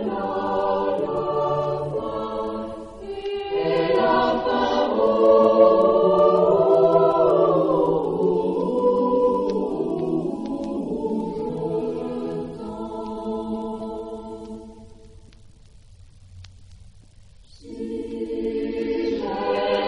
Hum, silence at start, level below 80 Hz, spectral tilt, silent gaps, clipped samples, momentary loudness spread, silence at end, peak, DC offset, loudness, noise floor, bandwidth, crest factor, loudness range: none; 0 s; -50 dBFS; -7.5 dB/octave; none; under 0.1%; 15 LU; 0 s; -4 dBFS; under 0.1%; -22 LUFS; -48 dBFS; 10 kHz; 18 dB; 17 LU